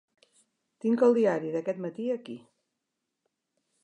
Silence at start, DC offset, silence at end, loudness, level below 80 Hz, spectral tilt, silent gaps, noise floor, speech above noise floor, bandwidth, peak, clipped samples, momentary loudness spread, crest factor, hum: 0.85 s; under 0.1%; 1.45 s; -28 LUFS; -86 dBFS; -7.5 dB/octave; none; -84 dBFS; 57 dB; 9.6 kHz; -10 dBFS; under 0.1%; 15 LU; 20 dB; none